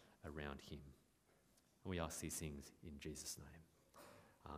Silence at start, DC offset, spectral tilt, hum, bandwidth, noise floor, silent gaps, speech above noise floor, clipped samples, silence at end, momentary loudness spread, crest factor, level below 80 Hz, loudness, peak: 0 s; under 0.1%; -4 dB/octave; none; 15.5 kHz; -76 dBFS; none; 25 dB; under 0.1%; 0 s; 18 LU; 24 dB; -64 dBFS; -51 LUFS; -28 dBFS